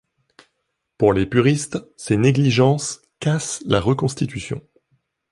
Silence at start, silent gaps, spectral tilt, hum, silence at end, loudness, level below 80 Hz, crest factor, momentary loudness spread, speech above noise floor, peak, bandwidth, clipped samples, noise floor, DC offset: 1 s; none; -5.5 dB/octave; none; 0.7 s; -20 LUFS; -46 dBFS; 18 dB; 13 LU; 56 dB; -2 dBFS; 11.5 kHz; under 0.1%; -75 dBFS; under 0.1%